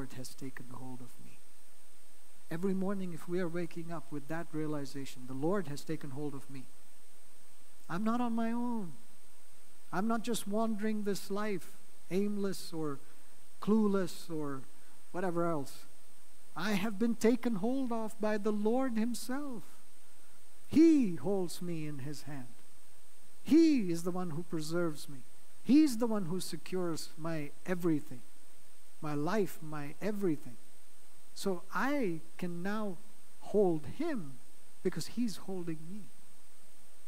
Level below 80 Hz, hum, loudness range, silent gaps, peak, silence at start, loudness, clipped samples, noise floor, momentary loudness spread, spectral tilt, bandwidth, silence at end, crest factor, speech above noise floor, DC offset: -74 dBFS; none; 7 LU; none; -16 dBFS; 0 s; -35 LUFS; under 0.1%; -63 dBFS; 18 LU; -6 dB/octave; 16 kHz; 1 s; 20 dB; 29 dB; 2%